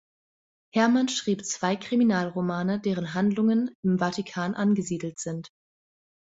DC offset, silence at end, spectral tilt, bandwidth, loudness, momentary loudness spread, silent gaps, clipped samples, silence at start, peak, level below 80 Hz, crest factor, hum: under 0.1%; 0.9 s; -5.5 dB/octave; 8 kHz; -26 LUFS; 9 LU; 3.75-3.83 s; under 0.1%; 0.75 s; -8 dBFS; -66 dBFS; 20 dB; none